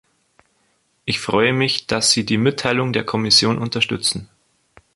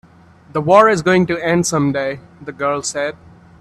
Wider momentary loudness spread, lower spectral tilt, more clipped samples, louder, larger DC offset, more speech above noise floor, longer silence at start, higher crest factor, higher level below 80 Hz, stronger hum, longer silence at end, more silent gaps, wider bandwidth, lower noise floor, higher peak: second, 9 LU vs 14 LU; second, -3.5 dB/octave vs -5 dB/octave; neither; about the same, -17 LUFS vs -16 LUFS; neither; first, 46 dB vs 29 dB; first, 1.05 s vs 0.55 s; about the same, 18 dB vs 16 dB; about the same, -52 dBFS vs -52 dBFS; neither; first, 0.7 s vs 0.5 s; neither; second, 11.5 kHz vs 13 kHz; first, -64 dBFS vs -45 dBFS; about the same, -2 dBFS vs 0 dBFS